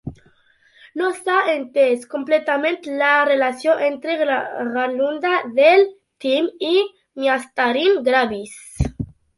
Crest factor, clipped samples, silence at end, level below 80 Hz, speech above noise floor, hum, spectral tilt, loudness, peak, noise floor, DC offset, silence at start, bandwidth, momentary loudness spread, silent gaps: 16 dB; under 0.1%; 0.3 s; -42 dBFS; 38 dB; none; -5 dB/octave; -19 LUFS; -4 dBFS; -56 dBFS; under 0.1%; 0.05 s; 11.5 kHz; 11 LU; none